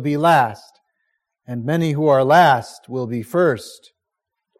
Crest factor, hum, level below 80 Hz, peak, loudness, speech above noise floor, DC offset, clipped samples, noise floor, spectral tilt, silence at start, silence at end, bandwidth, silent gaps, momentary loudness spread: 16 dB; none; -64 dBFS; -2 dBFS; -17 LUFS; 64 dB; under 0.1%; under 0.1%; -81 dBFS; -6.5 dB/octave; 0 s; 0.85 s; 15.5 kHz; none; 15 LU